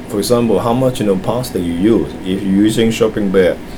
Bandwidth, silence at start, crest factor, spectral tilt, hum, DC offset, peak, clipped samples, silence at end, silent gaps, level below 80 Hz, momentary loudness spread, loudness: over 20 kHz; 0 s; 14 dB; -6 dB/octave; none; under 0.1%; 0 dBFS; under 0.1%; 0 s; none; -36 dBFS; 5 LU; -14 LUFS